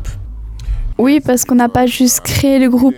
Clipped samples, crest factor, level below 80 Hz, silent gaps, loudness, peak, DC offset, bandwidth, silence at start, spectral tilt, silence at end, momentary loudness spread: under 0.1%; 10 dB; -26 dBFS; none; -12 LUFS; -2 dBFS; under 0.1%; over 20 kHz; 0 s; -4.5 dB/octave; 0 s; 17 LU